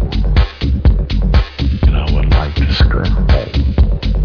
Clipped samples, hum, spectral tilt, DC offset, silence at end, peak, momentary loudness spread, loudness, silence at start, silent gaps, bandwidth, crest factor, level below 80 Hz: under 0.1%; none; -8 dB/octave; under 0.1%; 0 s; 0 dBFS; 3 LU; -15 LUFS; 0 s; none; 5.4 kHz; 12 dB; -14 dBFS